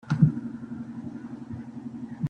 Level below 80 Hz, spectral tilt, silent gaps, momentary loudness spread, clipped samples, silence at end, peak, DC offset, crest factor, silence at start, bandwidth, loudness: -60 dBFS; -9.5 dB/octave; none; 15 LU; under 0.1%; 0 s; -6 dBFS; under 0.1%; 22 dB; 0.05 s; 6.6 kHz; -31 LUFS